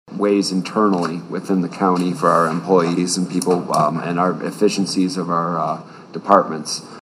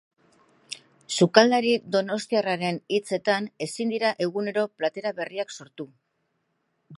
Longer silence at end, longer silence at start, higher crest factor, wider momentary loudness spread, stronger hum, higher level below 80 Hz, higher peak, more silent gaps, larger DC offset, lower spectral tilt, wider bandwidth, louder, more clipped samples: about the same, 0 s vs 0 s; second, 0.1 s vs 0.7 s; second, 18 dB vs 26 dB; second, 8 LU vs 21 LU; neither; first, -68 dBFS vs -78 dBFS; about the same, 0 dBFS vs 0 dBFS; neither; neither; about the same, -5.5 dB/octave vs -4.5 dB/octave; first, 15 kHz vs 11.5 kHz; first, -18 LUFS vs -25 LUFS; neither